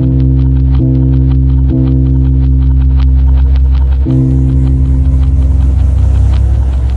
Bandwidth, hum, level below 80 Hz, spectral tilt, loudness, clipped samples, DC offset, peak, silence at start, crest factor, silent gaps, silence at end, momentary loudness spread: 4.1 kHz; none; -10 dBFS; -10.5 dB/octave; -10 LUFS; under 0.1%; under 0.1%; 0 dBFS; 0 s; 8 dB; none; 0 s; 1 LU